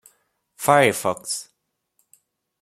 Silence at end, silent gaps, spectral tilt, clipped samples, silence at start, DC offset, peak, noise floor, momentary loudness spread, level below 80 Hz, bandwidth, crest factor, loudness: 1.2 s; none; -3.5 dB/octave; under 0.1%; 0.6 s; under 0.1%; 0 dBFS; -70 dBFS; 12 LU; -66 dBFS; 16 kHz; 24 dB; -20 LUFS